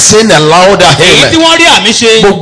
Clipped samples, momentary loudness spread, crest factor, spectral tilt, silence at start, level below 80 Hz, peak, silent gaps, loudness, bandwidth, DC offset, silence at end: 20%; 2 LU; 4 dB; -2.5 dB/octave; 0 s; -32 dBFS; 0 dBFS; none; -2 LUFS; 11 kHz; under 0.1%; 0 s